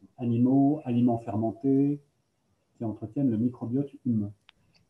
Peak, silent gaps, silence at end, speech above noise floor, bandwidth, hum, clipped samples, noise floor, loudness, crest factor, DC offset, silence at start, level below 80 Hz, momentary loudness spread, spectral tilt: -14 dBFS; none; 0.55 s; 47 dB; 3.6 kHz; none; under 0.1%; -73 dBFS; -28 LUFS; 14 dB; under 0.1%; 0.2 s; -64 dBFS; 12 LU; -11.5 dB/octave